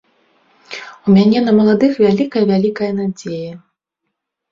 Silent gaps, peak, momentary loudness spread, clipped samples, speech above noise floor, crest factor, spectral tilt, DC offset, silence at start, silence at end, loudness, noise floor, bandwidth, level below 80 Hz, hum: none; -2 dBFS; 19 LU; under 0.1%; 63 dB; 14 dB; -7.5 dB/octave; under 0.1%; 0.7 s; 0.95 s; -14 LUFS; -76 dBFS; 7.4 kHz; -54 dBFS; none